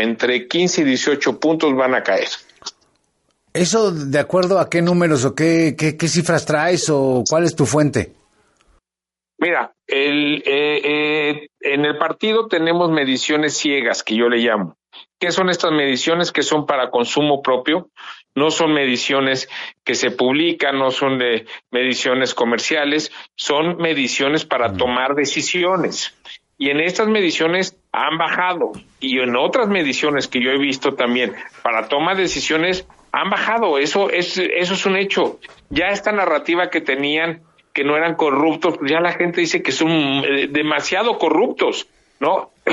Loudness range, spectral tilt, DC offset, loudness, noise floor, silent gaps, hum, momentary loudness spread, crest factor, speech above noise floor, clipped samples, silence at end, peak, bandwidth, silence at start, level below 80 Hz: 2 LU; -4 dB/octave; under 0.1%; -18 LUFS; -89 dBFS; none; none; 6 LU; 16 dB; 71 dB; under 0.1%; 0 s; -2 dBFS; 11.5 kHz; 0 s; -56 dBFS